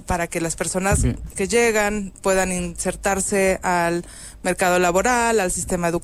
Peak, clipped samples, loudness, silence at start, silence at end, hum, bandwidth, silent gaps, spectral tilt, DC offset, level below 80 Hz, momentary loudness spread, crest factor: -8 dBFS; under 0.1%; -20 LUFS; 0 s; 0 s; none; 16 kHz; none; -4 dB/octave; under 0.1%; -34 dBFS; 7 LU; 14 dB